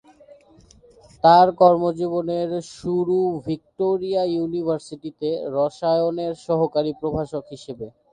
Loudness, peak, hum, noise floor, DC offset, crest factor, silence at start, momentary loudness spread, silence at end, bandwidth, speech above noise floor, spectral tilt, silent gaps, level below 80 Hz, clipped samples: -21 LUFS; -2 dBFS; none; -52 dBFS; under 0.1%; 20 dB; 1.25 s; 15 LU; 0.25 s; 9.8 kHz; 31 dB; -7 dB/octave; none; -56 dBFS; under 0.1%